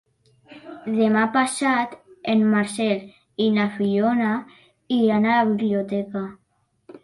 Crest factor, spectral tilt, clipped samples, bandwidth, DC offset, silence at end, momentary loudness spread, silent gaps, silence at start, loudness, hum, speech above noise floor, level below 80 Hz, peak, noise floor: 14 dB; -5.5 dB/octave; under 0.1%; 11.5 kHz; under 0.1%; 0.05 s; 12 LU; none; 0.5 s; -21 LUFS; none; 33 dB; -66 dBFS; -8 dBFS; -54 dBFS